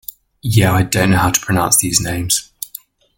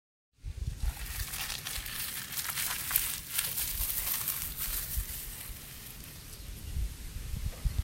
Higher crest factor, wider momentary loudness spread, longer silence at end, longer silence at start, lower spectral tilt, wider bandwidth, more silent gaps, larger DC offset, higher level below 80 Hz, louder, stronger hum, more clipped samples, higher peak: second, 16 dB vs 30 dB; about the same, 17 LU vs 15 LU; first, 0.5 s vs 0 s; about the same, 0.45 s vs 0.45 s; first, -3.5 dB/octave vs -1.5 dB/octave; about the same, 17 kHz vs 17 kHz; neither; neither; about the same, -40 dBFS vs -42 dBFS; first, -14 LUFS vs -34 LUFS; neither; neither; first, 0 dBFS vs -6 dBFS